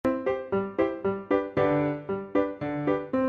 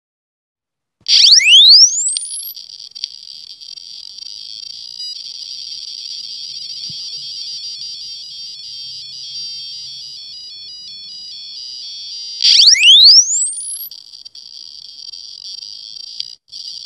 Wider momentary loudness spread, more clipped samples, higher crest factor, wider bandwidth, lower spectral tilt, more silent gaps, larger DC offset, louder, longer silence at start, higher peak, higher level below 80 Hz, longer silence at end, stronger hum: second, 5 LU vs 26 LU; neither; about the same, 16 dB vs 16 dB; second, 6.6 kHz vs 13 kHz; first, -9 dB/octave vs 5.5 dB/octave; neither; neither; second, -28 LUFS vs -6 LUFS; second, 0.05 s vs 1.1 s; second, -10 dBFS vs 0 dBFS; first, -56 dBFS vs -70 dBFS; about the same, 0 s vs 0.1 s; neither